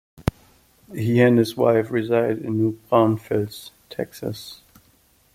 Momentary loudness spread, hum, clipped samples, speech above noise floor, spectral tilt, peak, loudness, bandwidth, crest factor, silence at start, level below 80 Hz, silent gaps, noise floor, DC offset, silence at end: 18 LU; none; under 0.1%; 38 dB; -7.5 dB/octave; -2 dBFS; -21 LUFS; 16 kHz; 20 dB; 0.25 s; -48 dBFS; none; -59 dBFS; under 0.1%; 0.8 s